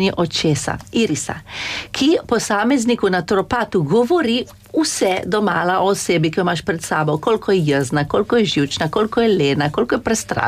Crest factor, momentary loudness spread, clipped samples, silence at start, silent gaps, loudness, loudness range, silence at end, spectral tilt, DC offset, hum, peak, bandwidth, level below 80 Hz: 12 dB; 5 LU; under 0.1%; 0 s; none; -18 LUFS; 1 LU; 0 s; -4.5 dB/octave; under 0.1%; none; -6 dBFS; 15.5 kHz; -46 dBFS